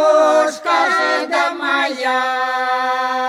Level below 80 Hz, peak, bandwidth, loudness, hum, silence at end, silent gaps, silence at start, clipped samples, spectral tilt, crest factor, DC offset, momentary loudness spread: -74 dBFS; -2 dBFS; 14.5 kHz; -16 LUFS; none; 0 s; none; 0 s; under 0.1%; -1 dB/octave; 14 dB; under 0.1%; 5 LU